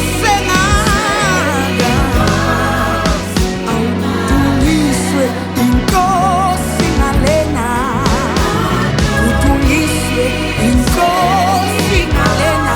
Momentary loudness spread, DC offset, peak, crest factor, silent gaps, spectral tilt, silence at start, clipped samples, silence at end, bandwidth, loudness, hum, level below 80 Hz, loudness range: 4 LU; under 0.1%; 0 dBFS; 12 dB; none; -5 dB/octave; 0 s; under 0.1%; 0 s; over 20 kHz; -13 LUFS; none; -22 dBFS; 1 LU